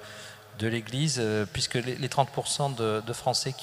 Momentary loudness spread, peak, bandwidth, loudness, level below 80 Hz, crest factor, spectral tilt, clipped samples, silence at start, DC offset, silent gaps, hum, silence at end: 6 LU; -8 dBFS; 15.5 kHz; -29 LUFS; -58 dBFS; 22 dB; -4 dB/octave; under 0.1%; 0 s; under 0.1%; none; none; 0 s